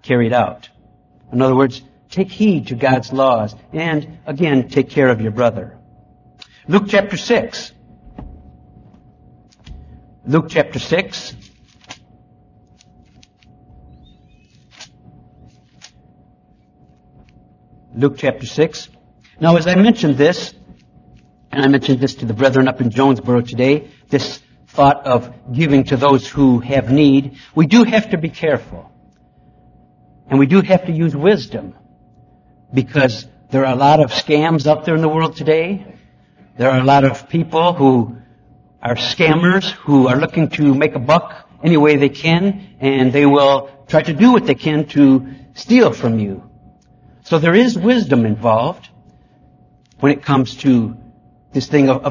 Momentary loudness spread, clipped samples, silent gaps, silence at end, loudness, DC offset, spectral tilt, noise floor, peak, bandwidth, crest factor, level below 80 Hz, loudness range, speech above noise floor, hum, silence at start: 13 LU; under 0.1%; none; 0 s; -15 LUFS; under 0.1%; -7 dB/octave; -52 dBFS; 0 dBFS; 7.4 kHz; 16 dB; -48 dBFS; 8 LU; 38 dB; none; 0.05 s